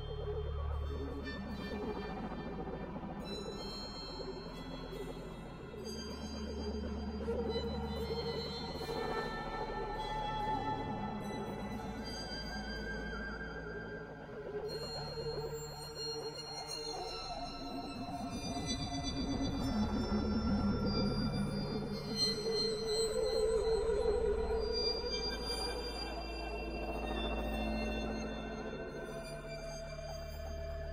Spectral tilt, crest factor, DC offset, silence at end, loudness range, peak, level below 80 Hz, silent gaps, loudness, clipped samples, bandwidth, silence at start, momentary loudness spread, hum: -5 dB/octave; 16 dB; under 0.1%; 0 s; 8 LU; -22 dBFS; -46 dBFS; none; -39 LUFS; under 0.1%; 16 kHz; 0 s; 10 LU; none